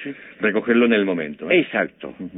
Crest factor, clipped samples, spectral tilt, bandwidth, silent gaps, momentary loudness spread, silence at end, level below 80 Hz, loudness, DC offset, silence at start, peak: 14 dB; under 0.1%; -10 dB/octave; 4 kHz; none; 12 LU; 0 s; -64 dBFS; -20 LUFS; under 0.1%; 0 s; -6 dBFS